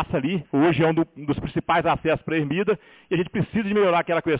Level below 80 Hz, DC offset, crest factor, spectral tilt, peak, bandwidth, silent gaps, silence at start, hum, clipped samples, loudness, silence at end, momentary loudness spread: -48 dBFS; under 0.1%; 12 dB; -11 dB/octave; -10 dBFS; 4 kHz; none; 0 s; none; under 0.1%; -23 LUFS; 0 s; 7 LU